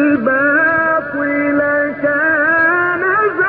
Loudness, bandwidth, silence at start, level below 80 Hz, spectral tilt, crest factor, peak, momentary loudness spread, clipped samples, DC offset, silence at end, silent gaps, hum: -13 LUFS; 4.8 kHz; 0 s; -52 dBFS; -10 dB/octave; 10 dB; -4 dBFS; 4 LU; under 0.1%; under 0.1%; 0 s; none; none